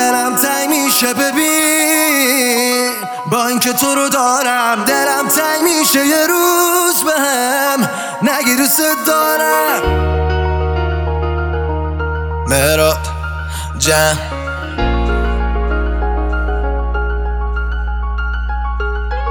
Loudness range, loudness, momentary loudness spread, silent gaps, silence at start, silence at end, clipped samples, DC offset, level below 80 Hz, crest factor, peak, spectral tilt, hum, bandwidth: 6 LU; -14 LUFS; 9 LU; none; 0 s; 0 s; under 0.1%; under 0.1%; -22 dBFS; 14 dB; 0 dBFS; -3.5 dB/octave; none; over 20 kHz